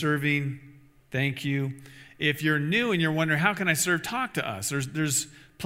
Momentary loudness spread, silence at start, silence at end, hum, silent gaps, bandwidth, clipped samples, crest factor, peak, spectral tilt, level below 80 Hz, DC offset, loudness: 11 LU; 0 s; 0 s; none; none; 16 kHz; under 0.1%; 22 dB; -6 dBFS; -4 dB/octave; -64 dBFS; under 0.1%; -26 LUFS